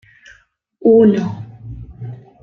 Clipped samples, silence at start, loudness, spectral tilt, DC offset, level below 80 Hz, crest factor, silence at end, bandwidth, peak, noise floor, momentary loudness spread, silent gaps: under 0.1%; 0.85 s; -13 LUFS; -9.5 dB/octave; under 0.1%; -46 dBFS; 16 dB; 0.25 s; 6.4 kHz; -2 dBFS; -53 dBFS; 23 LU; none